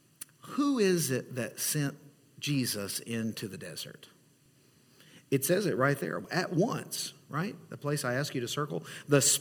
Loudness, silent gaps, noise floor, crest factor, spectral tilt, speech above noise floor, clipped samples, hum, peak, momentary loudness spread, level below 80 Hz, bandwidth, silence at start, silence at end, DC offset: -31 LUFS; none; -64 dBFS; 22 dB; -4 dB/octave; 33 dB; under 0.1%; none; -10 dBFS; 12 LU; -74 dBFS; 18 kHz; 0.45 s; 0 s; under 0.1%